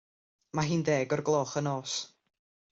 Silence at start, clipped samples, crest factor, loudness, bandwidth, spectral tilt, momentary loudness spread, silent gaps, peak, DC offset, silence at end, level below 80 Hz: 0.55 s; under 0.1%; 18 dB; -30 LUFS; 8 kHz; -5 dB/octave; 8 LU; none; -14 dBFS; under 0.1%; 0.65 s; -68 dBFS